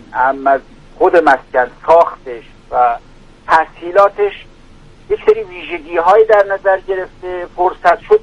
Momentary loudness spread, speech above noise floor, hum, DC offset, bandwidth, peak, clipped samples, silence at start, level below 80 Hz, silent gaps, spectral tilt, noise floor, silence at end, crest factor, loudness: 14 LU; 27 dB; none; under 0.1%; 9.8 kHz; 0 dBFS; under 0.1%; 0.1 s; -42 dBFS; none; -5.5 dB/octave; -40 dBFS; 0.05 s; 14 dB; -13 LUFS